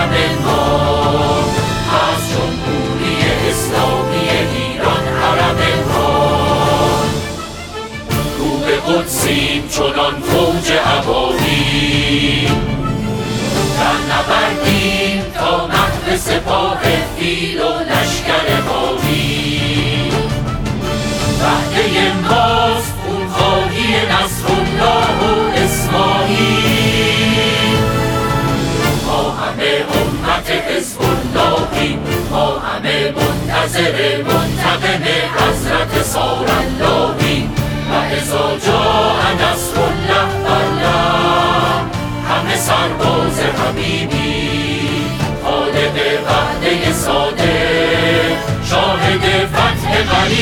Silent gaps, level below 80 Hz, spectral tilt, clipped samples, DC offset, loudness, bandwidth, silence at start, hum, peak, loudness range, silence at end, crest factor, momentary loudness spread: none; -30 dBFS; -4.5 dB/octave; under 0.1%; under 0.1%; -14 LUFS; over 20 kHz; 0 s; none; 0 dBFS; 2 LU; 0 s; 14 dB; 5 LU